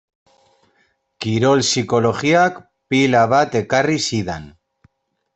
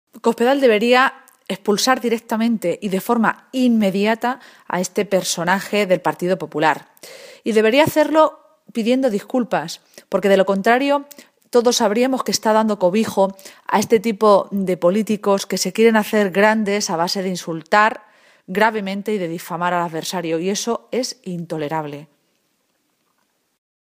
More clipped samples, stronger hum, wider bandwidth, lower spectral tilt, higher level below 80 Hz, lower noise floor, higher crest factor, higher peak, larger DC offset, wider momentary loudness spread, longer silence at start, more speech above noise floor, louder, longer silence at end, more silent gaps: neither; neither; second, 8.4 kHz vs 15.5 kHz; about the same, -4.5 dB/octave vs -4.5 dB/octave; first, -54 dBFS vs -66 dBFS; second, -63 dBFS vs -67 dBFS; about the same, 16 dB vs 18 dB; about the same, -2 dBFS vs 0 dBFS; neither; about the same, 9 LU vs 11 LU; first, 1.2 s vs 0.15 s; about the same, 47 dB vs 49 dB; about the same, -17 LUFS vs -18 LUFS; second, 0.85 s vs 1.95 s; neither